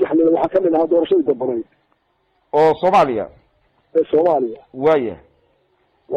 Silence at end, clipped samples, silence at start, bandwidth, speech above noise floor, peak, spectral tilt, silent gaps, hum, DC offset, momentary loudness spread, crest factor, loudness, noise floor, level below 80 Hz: 0 s; under 0.1%; 0 s; 8 kHz; 48 dB; -6 dBFS; -7.5 dB/octave; none; none; under 0.1%; 11 LU; 12 dB; -17 LUFS; -64 dBFS; -56 dBFS